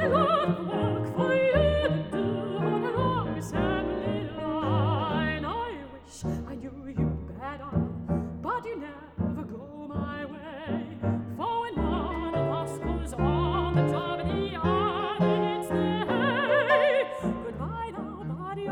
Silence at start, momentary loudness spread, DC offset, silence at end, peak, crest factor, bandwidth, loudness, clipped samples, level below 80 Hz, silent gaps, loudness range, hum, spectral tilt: 0 s; 13 LU; under 0.1%; 0 s; -10 dBFS; 18 dB; 15 kHz; -28 LUFS; under 0.1%; -42 dBFS; none; 7 LU; none; -7 dB/octave